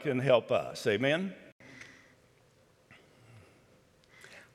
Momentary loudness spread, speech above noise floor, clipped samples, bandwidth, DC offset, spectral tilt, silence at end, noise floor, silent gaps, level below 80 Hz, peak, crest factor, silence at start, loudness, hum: 25 LU; 36 dB; under 0.1%; 14 kHz; under 0.1%; -5.5 dB/octave; 0.15 s; -65 dBFS; 1.52-1.59 s; -76 dBFS; -12 dBFS; 22 dB; 0 s; -30 LUFS; none